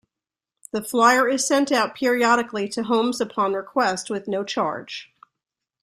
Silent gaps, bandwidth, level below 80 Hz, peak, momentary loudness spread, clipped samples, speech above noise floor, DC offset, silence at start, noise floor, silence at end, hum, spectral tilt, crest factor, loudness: none; 15 kHz; -68 dBFS; -4 dBFS; 12 LU; under 0.1%; 67 dB; under 0.1%; 0.75 s; -89 dBFS; 0.8 s; none; -3 dB/octave; 20 dB; -21 LUFS